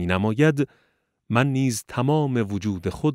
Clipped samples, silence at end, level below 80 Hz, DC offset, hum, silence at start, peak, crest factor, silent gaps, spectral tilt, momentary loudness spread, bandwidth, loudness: under 0.1%; 0 s; -52 dBFS; under 0.1%; none; 0 s; -4 dBFS; 20 dB; none; -6.5 dB/octave; 7 LU; 16 kHz; -23 LUFS